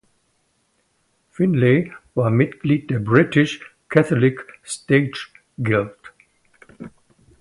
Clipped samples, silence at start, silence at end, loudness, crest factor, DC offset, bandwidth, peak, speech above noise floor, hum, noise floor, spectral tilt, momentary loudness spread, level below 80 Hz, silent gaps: under 0.1%; 1.4 s; 0.5 s; -19 LUFS; 20 dB; under 0.1%; 11.5 kHz; 0 dBFS; 48 dB; none; -66 dBFS; -7 dB/octave; 19 LU; -56 dBFS; none